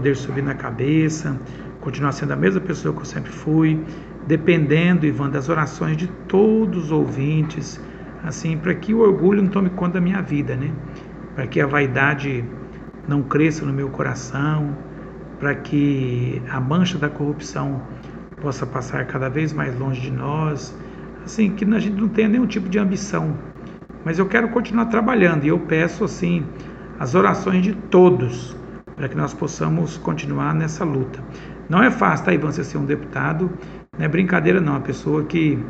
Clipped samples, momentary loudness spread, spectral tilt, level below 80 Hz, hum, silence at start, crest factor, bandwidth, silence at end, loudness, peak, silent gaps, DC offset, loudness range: under 0.1%; 16 LU; -7 dB/octave; -44 dBFS; none; 0 s; 20 dB; 8 kHz; 0 s; -20 LUFS; 0 dBFS; none; under 0.1%; 5 LU